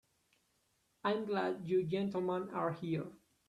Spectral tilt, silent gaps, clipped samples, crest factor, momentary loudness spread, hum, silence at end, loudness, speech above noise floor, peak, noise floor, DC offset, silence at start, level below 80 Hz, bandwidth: -8 dB/octave; none; under 0.1%; 18 dB; 6 LU; none; 0.3 s; -37 LUFS; 41 dB; -20 dBFS; -78 dBFS; under 0.1%; 1.05 s; -76 dBFS; 11 kHz